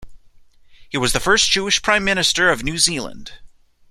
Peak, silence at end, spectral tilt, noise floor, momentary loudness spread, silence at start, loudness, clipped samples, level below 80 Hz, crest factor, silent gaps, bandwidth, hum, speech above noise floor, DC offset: -2 dBFS; 0.45 s; -2 dB/octave; -47 dBFS; 10 LU; 0 s; -17 LUFS; under 0.1%; -38 dBFS; 18 dB; none; 16 kHz; none; 29 dB; under 0.1%